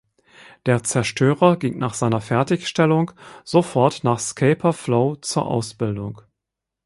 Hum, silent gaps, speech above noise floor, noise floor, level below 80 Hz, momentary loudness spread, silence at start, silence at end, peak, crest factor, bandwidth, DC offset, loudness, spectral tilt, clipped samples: none; none; 64 dB; -84 dBFS; -56 dBFS; 9 LU; 0.65 s; 0.65 s; -2 dBFS; 18 dB; 11.5 kHz; under 0.1%; -20 LUFS; -5.5 dB/octave; under 0.1%